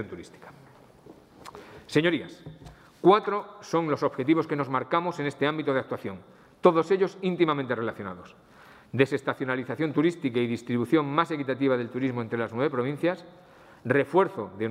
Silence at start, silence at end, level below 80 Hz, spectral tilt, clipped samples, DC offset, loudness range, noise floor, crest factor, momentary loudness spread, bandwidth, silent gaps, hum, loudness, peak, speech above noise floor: 0 s; 0 s; -68 dBFS; -7 dB/octave; under 0.1%; under 0.1%; 2 LU; -52 dBFS; 22 dB; 16 LU; 11.5 kHz; none; none; -26 LUFS; -4 dBFS; 26 dB